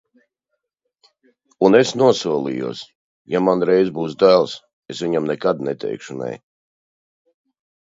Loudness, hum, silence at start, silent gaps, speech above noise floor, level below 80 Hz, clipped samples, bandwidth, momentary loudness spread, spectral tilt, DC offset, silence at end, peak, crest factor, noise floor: -18 LUFS; none; 1.6 s; 2.95-3.25 s, 4.73-4.82 s; 60 dB; -62 dBFS; under 0.1%; 7.8 kHz; 15 LU; -5.5 dB/octave; under 0.1%; 1.45 s; 0 dBFS; 20 dB; -78 dBFS